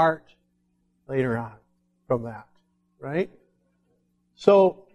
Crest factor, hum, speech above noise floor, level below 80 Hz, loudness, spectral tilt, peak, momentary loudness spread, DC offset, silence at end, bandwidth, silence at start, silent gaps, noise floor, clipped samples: 24 dB; none; 47 dB; -62 dBFS; -24 LUFS; -7.5 dB/octave; -4 dBFS; 21 LU; under 0.1%; 0.2 s; 8.6 kHz; 0 s; none; -70 dBFS; under 0.1%